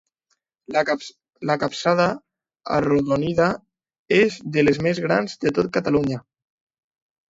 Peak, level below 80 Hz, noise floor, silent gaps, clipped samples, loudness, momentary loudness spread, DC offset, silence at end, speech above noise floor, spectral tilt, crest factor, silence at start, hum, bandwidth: -4 dBFS; -54 dBFS; -73 dBFS; 3.99-4.05 s; under 0.1%; -21 LUFS; 11 LU; under 0.1%; 1.1 s; 52 dB; -6 dB/octave; 18 dB; 0.7 s; none; 8 kHz